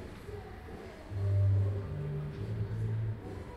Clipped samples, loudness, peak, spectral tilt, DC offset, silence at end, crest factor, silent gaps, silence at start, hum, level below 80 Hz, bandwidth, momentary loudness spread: under 0.1%; -35 LUFS; -22 dBFS; -9 dB/octave; under 0.1%; 0 s; 12 dB; none; 0 s; none; -50 dBFS; 5.4 kHz; 17 LU